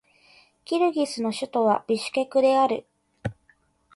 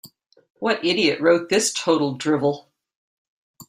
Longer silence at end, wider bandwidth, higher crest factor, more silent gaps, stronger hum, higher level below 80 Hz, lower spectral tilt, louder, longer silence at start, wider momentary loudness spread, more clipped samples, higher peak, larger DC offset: first, 0.65 s vs 0.05 s; second, 11.5 kHz vs 15.5 kHz; about the same, 16 dB vs 18 dB; second, none vs 0.50-0.55 s, 2.95-3.54 s; neither; first, -60 dBFS vs -66 dBFS; first, -5 dB/octave vs -3.5 dB/octave; second, -24 LUFS vs -20 LUFS; first, 0.7 s vs 0.05 s; first, 16 LU vs 7 LU; neither; second, -10 dBFS vs -4 dBFS; neither